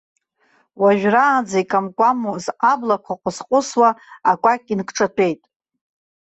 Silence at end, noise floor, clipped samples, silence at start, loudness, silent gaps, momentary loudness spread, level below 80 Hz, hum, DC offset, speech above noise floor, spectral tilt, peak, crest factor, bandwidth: 0.85 s; -61 dBFS; under 0.1%; 0.8 s; -18 LUFS; none; 8 LU; -64 dBFS; none; under 0.1%; 43 dB; -5 dB/octave; -2 dBFS; 16 dB; 8.2 kHz